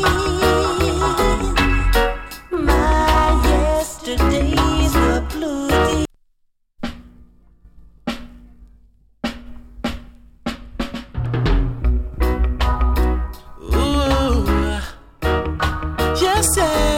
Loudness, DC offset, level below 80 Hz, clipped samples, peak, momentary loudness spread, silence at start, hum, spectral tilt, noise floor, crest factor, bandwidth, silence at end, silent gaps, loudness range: -19 LUFS; under 0.1%; -22 dBFS; under 0.1%; -4 dBFS; 14 LU; 0 s; none; -5 dB/octave; -63 dBFS; 14 dB; 17 kHz; 0 s; none; 15 LU